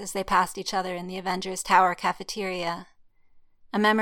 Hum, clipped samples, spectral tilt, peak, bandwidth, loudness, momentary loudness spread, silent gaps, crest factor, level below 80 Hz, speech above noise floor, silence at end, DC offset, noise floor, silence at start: none; under 0.1%; -3.5 dB/octave; -6 dBFS; 17 kHz; -26 LUFS; 12 LU; none; 22 dB; -56 dBFS; 30 dB; 0 s; under 0.1%; -55 dBFS; 0 s